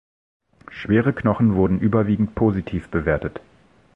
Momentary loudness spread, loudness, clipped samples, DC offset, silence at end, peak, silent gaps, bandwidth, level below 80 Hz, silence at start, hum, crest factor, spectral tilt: 14 LU; -20 LUFS; under 0.1%; under 0.1%; 0.55 s; -4 dBFS; none; 5.6 kHz; -40 dBFS; 0.7 s; none; 18 dB; -10 dB/octave